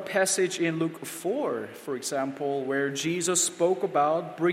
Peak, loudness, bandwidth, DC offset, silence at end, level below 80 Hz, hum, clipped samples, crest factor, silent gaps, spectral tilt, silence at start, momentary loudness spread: -12 dBFS; -27 LUFS; 16 kHz; under 0.1%; 0 s; -78 dBFS; none; under 0.1%; 16 dB; none; -3.5 dB/octave; 0 s; 8 LU